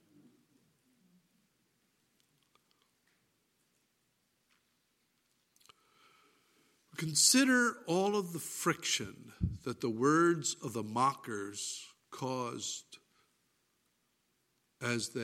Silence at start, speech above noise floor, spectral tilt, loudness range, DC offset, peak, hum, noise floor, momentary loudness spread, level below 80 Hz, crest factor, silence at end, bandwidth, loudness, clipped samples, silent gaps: 6.95 s; 45 dB; -3 dB/octave; 12 LU; under 0.1%; -14 dBFS; none; -78 dBFS; 15 LU; -62 dBFS; 24 dB; 0 s; 16.5 kHz; -32 LUFS; under 0.1%; none